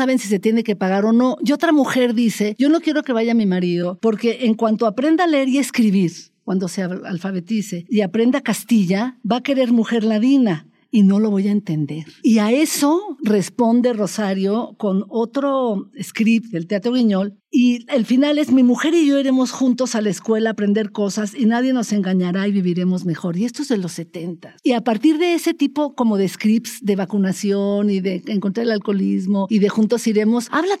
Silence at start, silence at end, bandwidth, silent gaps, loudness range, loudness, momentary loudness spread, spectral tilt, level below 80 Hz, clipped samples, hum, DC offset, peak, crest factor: 0 s; 0 s; 14.5 kHz; none; 3 LU; -18 LUFS; 7 LU; -6 dB/octave; -72 dBFS; under 0.1%; none; under 0.1%; -4 dBFS; 14 dB